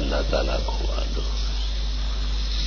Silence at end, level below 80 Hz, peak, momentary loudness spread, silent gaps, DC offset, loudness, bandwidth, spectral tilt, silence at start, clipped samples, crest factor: 0 s; -24 dBFS; -10 dBFS; 4 LU; none; under 0.1%; -27 LUFS; 6.8 kHz; -5 dB/octave; 0 s; under 0.1%; 14 dB